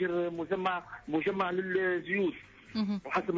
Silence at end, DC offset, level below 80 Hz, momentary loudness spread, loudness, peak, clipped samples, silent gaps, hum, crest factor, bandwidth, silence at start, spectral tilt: 0 s; under 0.1%; -66 dBFS; 5 LU; -32 LUFS; -18 dBFS; under 0.1%; none; none; 14 dB; 7.6 kHz; 0 s; -7 dB/octave